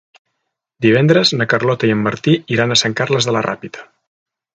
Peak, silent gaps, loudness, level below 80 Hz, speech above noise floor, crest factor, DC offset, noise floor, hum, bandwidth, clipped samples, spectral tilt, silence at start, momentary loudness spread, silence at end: 0 dBFS; none; -15 LUFS; -56 dBFS; 60 dB; 16 dB; under 0.1%; -75 dBFS; none; 9.2 kHz; under 0.1%; -4.5 dB/octave; 0.8 s; 10 LU; 0.75 s